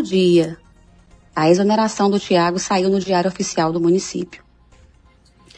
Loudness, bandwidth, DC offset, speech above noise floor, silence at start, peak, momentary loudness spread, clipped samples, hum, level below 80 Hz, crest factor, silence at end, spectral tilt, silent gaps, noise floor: -18 LUFS; 10 kHz; under 0.1%; 35 dB; 0 s; -4 dBFS; 11 LU; under 0.1%; none; -52 dBFS; 16 dB; 1.2 s; -5.5 dB/octave; none; -52 dBFS